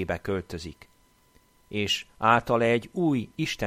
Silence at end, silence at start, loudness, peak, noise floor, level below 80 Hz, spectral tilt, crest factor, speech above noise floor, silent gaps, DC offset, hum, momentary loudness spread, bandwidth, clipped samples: 0 s; 0 s; -26 LUFS; -6 dBFS; -62 dBFS; -54 dBFS; -5 dB/octave; 22 dB; 35 dB; none; under 0.1%; none; 15 LU; 15.5 kHz; under 0.1%